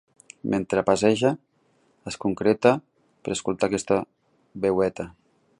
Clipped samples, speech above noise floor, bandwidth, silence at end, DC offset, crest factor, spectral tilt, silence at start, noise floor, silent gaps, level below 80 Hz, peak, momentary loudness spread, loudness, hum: under 0.1%; 42 dB; 11.5 kHz; 0.5 s; under 0.1%; 22 dB; -5.5 dB/octave; 0.45 s; -65 dBFS; none; -56 dBFS; -4 dBFS; 17 LU; -24 LUFS; none